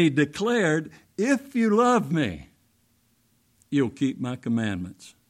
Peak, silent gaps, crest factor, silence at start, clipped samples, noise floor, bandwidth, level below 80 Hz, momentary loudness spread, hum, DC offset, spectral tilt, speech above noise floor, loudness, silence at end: -8 dBFS; none; 18 dB; 0 s; under 0.1%; -66 dBFS; 14.5 kHz; -60 dBFS; 11 LU; none; under 0.1%; -6 dB/octave; 42 dB; -25 LUFS; 0.2 s